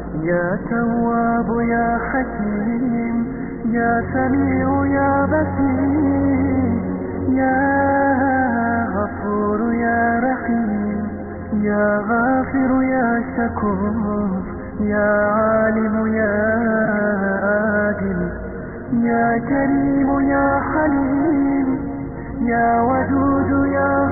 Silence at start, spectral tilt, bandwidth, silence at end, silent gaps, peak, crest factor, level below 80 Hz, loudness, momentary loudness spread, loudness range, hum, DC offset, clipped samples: 0 s; -3 dB/octave; 2.4 kHz; 0 s; none; -6 dBFS; 12 dB; -40 dBFS; -19 LUFS; 7 LU; 2 LU; none; 0.3%; under 0.1%